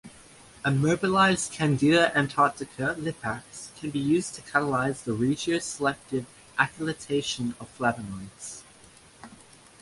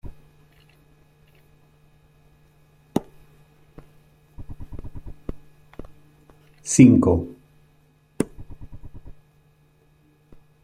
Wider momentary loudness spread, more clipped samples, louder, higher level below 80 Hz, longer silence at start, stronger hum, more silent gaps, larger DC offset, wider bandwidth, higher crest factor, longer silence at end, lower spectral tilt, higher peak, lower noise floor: second, 15 LU vs 32 LU; neither; second, -26 LUFS vs -19 LUFS; second, -58 dBFS vs -46 dBFS; about the same, 0.05 s vs 0.05 s; neither; neither; neither; second, 11.5 kHz vs 13.5 kHz; about the same, 22 dB vs 24 dB; second, 0.45 s vs 1.55 s; second, -5 dB/octave vs -6.5 dB/octave; second, -6 dBFS vs -2 dBFS; second, -53 dBFS vs -59 dBFS